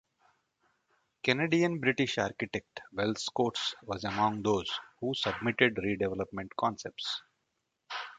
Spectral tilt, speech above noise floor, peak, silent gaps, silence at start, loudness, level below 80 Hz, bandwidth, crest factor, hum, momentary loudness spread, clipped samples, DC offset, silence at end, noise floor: -4.5 dB/octave; 50 dB; -8 dBFS; none; 1.25 s; -32 LUFS; -62 dBFS; 9.4 kHz; 24 dB; none; 10 LU; under 0.1%; under 0.1%; 0 s; -81 dBFS